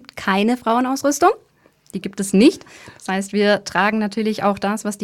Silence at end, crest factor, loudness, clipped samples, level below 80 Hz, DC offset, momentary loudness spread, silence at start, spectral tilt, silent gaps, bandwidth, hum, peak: 0 s; 16 dB; -18 LUFS; under 0.1%; -58 dBFS; under 0.1%; 15 LU; 0.15 s; -4.5 dB/octave; none; 15 kHz; none; -2 dBFS